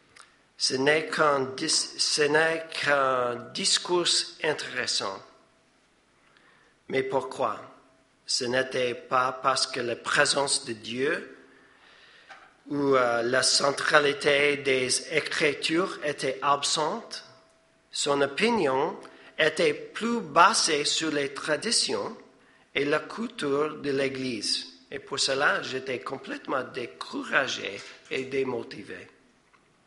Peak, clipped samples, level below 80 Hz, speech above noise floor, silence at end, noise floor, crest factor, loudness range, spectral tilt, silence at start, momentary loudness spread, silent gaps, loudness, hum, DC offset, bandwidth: -2 dBFS; under 0.1%; -72 dBFS; 38 dB; 0.8 s; -64 dBFS; 26 dB; 7 LU; -2 dB/octave; 0.2 s; 13 LU; none; -26 LUFS; none; under 0.1%; 11.5 kHz